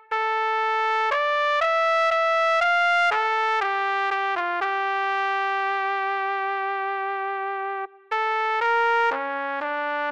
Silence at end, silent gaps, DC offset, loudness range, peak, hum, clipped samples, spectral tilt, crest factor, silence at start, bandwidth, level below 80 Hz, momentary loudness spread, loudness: 0 s; none; under 0.1%; 5 LU; -10 dBFS; none; under 0.1%; -1 dB/octave; 12 dB; 0.1 s; 9.6 kHz; -72 dBFS; 8 LU; -23 LUFS